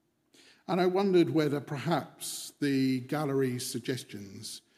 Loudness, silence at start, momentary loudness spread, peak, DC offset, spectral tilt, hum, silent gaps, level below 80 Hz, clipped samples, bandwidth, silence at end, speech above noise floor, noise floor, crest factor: -30 LUFS; 0.7 s; 16 LU; -14 dBFS; under 0.1%; -5.5 dB/octave; none; none; -80 dBFS; under 0.1%; 15.5 kHz; 0.2 s; 32 dB; -62 dBFS; 18 dB